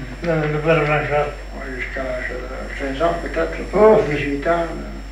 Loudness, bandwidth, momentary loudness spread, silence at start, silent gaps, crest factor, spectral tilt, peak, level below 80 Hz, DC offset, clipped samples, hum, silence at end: -20 LUFS; 10.5 kHz; 14 LU; 0 s; none; 16 dB; -6.5 dB/octave; -2 dBFS; -32 dBFS; under 0.1%; under 0.1%; none; 0 s